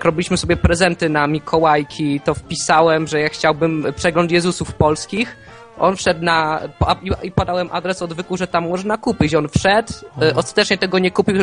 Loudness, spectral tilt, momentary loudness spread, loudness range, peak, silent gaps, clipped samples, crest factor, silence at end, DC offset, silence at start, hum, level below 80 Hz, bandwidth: -17 LUFS; -5 dB/octave; 6 LU; 3 LU; 0 dBFS; none; under 0.1%; 18 dB; 0 s; under 0.1%; 0 s; none; -36 dBFS; 10 kHz